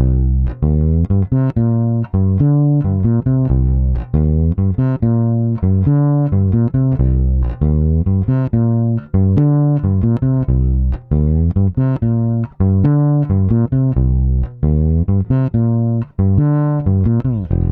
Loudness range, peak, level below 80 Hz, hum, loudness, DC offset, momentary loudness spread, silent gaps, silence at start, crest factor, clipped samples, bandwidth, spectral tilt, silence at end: 1 LU; -2 dBFS; -22 dBFS; none; -15 LUFS; under 0.1%; 4 LU; none; 0 s; 12 dB; under 0.1%; 2.9 kHz; -13.5 dB/octave; 0 s